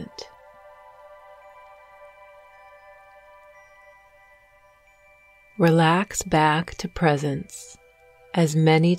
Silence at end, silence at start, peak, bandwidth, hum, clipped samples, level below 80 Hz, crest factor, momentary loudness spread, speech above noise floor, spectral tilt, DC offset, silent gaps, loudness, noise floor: 0 s; 0 s; -6 dBFS; 14.5 kHz; none; under 0.1%; -52 dBFS; 20 dB; 23 LU; 36 dB; -5.5 dB/octave; under 0.1%; none; -21 LUFS; -56 dBFS